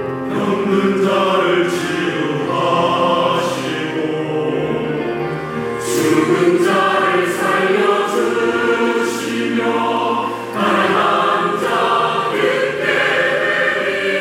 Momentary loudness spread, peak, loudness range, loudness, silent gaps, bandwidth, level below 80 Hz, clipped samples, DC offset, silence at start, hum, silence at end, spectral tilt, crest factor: 6 LU; -2 dBFS; 3 LU; -16 LUFS; none; 17 kHz; -58 dBFS; under 0.1%; under 0.1%; 0 s; none; 0 s; -4.5 dB/octave; 14 dB